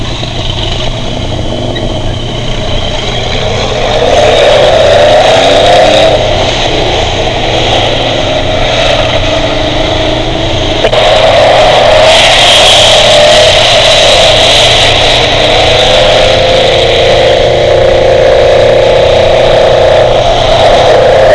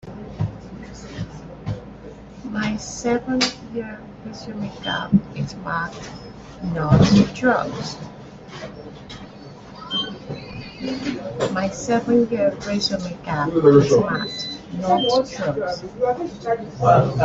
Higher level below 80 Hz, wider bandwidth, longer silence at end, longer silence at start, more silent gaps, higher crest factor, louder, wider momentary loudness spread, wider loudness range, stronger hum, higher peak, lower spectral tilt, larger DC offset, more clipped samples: first, -18 dBFS vs -46 dBFS; first, 11 kHz vs 8 kHz; about the same, 0 s vs 0 s; about the same, 0 s vs 0.05 s; neither; second, 6 dB vs 20 dB; first, -5 LUFS vs -21 LUFS; second, 11 LU vs 21 LU; about the same, 7 LU vs 9 LU; neither; about the same, 0 dBFS vs 0 dBFS; second, -3.5 dB/octave vs -6 dB/octave; first, 1% vs under 0.1%; first, 5% vs under 0.1%